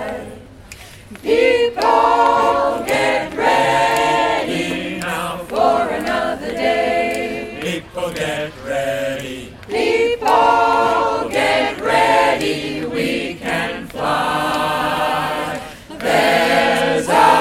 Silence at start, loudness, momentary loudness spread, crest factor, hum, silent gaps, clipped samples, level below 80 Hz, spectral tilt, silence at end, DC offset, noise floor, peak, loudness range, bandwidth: 0 s; -17 LUFS; 11 LU; 16 dB; none; none; under 0.1%; -46 dBFS; -4 dB/octave; 0 s; under 0.1%; -38 dBFS; 0 dBFS; 5 LU; 16.5 kHz